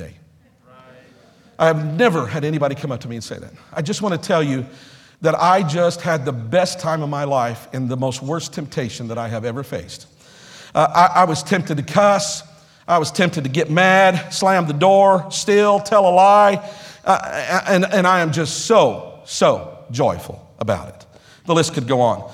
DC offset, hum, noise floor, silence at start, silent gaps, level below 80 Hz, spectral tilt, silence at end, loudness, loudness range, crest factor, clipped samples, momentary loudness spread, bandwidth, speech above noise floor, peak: under 0.1%; none; -51 dBFS; 0 s; none; -56 dBFS; -5 dB/octave; 0 s; -17 LUFS; 8 LU; 18 dB; under 0.1%; 15 LU; 15.5 kHz; 34 dB; 0 dBFS